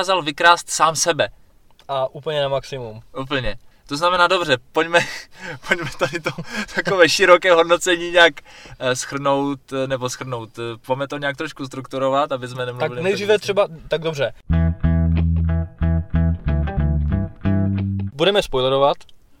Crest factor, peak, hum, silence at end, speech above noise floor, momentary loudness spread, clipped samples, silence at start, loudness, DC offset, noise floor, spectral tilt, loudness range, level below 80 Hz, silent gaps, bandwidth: 20 dB; 0 dBFS; none; 0.25 s; 30 dB; 14 LU; under 0.1%; 0 s; -19 LUFS; under 0.1%; -50 dBFS; -4.5 dB/octave; 8 LU; -34 dBFS; none; 15.5 kHz